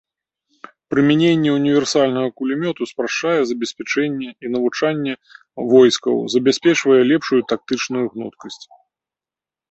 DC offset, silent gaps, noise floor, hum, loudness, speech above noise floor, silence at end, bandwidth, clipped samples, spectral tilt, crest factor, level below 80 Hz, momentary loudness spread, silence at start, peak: under 0.1%; none; -90 dBFS; none; -18 LUFS; 72 dB; 1.15 s; 8.2 kHz; under 0.1%; -5 dB/octave; 16 dB; -62 dBFS; 13 LU; 0.9 s; -2 dBFS